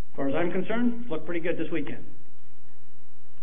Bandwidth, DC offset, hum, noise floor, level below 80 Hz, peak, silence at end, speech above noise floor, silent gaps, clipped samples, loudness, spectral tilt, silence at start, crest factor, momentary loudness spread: 3.7 kHz; 10%; none; -60 dBFS; -68 dBFS; -12 dBFS; 1.3 s; 30 dB; none; under 0.1%; -30 LUFS; -9.5 dB/octave; 0.15 s; 18 dB; 8 LU